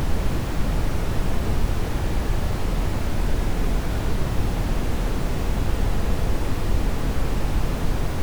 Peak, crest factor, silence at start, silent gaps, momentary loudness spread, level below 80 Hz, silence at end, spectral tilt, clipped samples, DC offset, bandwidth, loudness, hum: -8 dBFS; 12 dB; 0 s; none; 1 LU; -24 dBFS; 0 s; -6 dB/octave; under 0.1%; under 0.1%; over 20 kHz; -26 LUFS; none